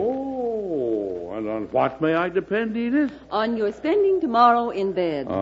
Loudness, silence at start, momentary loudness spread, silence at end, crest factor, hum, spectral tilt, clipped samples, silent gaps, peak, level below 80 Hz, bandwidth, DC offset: -23 LUFS; 0 s; 9 LU; 0 s; 18 dB; none; -7.5 dB/octave; under 0.1%; none; -4 dBFS; -56 dBFS; 7.6 kHz; under 0.1%